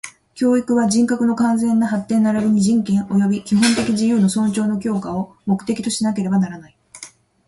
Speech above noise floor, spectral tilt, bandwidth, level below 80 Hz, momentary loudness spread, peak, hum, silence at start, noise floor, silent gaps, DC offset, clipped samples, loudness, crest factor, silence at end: 25 dB; -5.5 dB/octave; 11.5 kHz; -54 dBFS; 10 LU; -2 dBFS; none; 0.05 s; -42 dBFS; none; under 0.1%; under 0.1%; -18 LUFS; 14 dB; 0.4 s